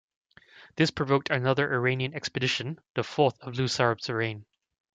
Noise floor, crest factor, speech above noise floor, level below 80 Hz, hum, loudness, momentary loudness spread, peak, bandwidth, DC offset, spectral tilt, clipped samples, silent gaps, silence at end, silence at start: -55 dBFS; 20 dB; 27 dB; -62 dBFS; none; -27 LUFS; 8 LU; -8 dBFS; 9.2 kHz; under 0.1%; -5 dB/octave; under 0.1%; 2.90-2.95 s; 0.55 s; 0.55 s